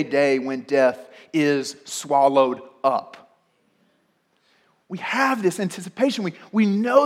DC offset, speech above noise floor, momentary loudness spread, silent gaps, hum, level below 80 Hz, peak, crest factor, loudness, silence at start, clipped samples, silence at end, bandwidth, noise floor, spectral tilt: under 0.1%; 45 dB; 11 LU; none; none; -78 dBFS; -4 dBFS; 18 dB; -22 LUFS; 0 s; under 0.1%; 0 s; 15.5 kHz; -66 dBFS; -5 dB/octave